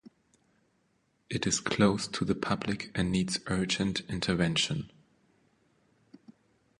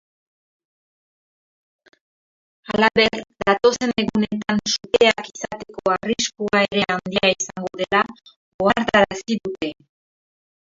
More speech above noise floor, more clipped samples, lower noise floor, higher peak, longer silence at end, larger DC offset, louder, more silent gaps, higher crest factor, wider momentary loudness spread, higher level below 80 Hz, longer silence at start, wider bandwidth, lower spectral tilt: second, 43 dB vs over 70 dB; neither; second, -73 dBFS vs under -90 dBFS; second, -10 dBFS vs 0 dBFS; second, 0.5 s vs 0.85 s; neither; second, -30 LUFS vs -20 LUFS; second, none vs 8.36-8.59 s; about the same, 22 dB vs 22 dB; second, 7 LU vs 11 LU; about the same, -54 dBFS vs -54 dBFS; second, 0.05 s vs 2.7 s; first, 11.5 kHz vs 7.8 kHz; about the same, -4.5 dB/octave vs -3.5 dB/octave